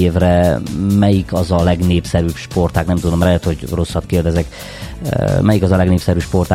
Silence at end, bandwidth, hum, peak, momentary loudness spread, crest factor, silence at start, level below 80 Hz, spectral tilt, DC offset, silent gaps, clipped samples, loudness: 0 s; 15.5 kHz; none; 0 dBFS; 7 LU; 14 dB; 0 s; -28 dBFS; -7 dB/octave; under 0.1%; none; under 0.1%; -15 LUFS